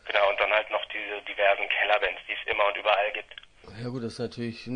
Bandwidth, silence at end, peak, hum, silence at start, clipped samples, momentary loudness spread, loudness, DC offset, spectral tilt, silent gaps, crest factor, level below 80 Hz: 10 kHz; 0 s; -8 dBFS; none; 0.05 s; under 0.1%; 13 LU; -26 LUFS; under 0.1%; -5 dB/octave; none; 20 dB; -60 dBFS